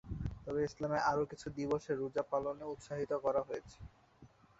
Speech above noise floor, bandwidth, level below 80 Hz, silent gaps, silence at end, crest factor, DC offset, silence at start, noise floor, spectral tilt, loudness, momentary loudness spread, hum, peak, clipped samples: 26 dB; 8 kHz; -56 dBFS; none; 0.35 s; 18 dB; under 0.1%; 0.05 s; -63 dBFS; -6 dB/octave; -38 LUFS; 11 LU; none; -20 dBFS; under 0.1%